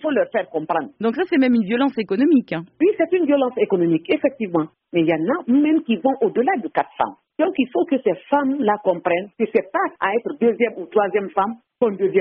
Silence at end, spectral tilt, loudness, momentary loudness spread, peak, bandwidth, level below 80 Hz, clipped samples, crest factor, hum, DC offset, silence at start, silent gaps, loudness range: 0 s; -5 dB/octave; -20 LUFS; 6 LU; -6 dBFS; 5.2 kHz; -64 dBFS; under 0.1%; 14 dB; none; under 0.1%; 0 s; none; 2 LU